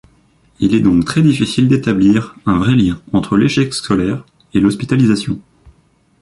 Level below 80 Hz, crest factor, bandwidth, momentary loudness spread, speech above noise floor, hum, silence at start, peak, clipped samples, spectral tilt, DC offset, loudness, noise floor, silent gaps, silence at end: -40 dBFS; 14 dB; 11.5 kHz; 7 LU; 41 dB; none; 0.6 s; 0 dBFS; under 0.1%; -6.5 dB/octave; under 0.1%; -14 LUFS; -54 dBFS; none; 0.8 s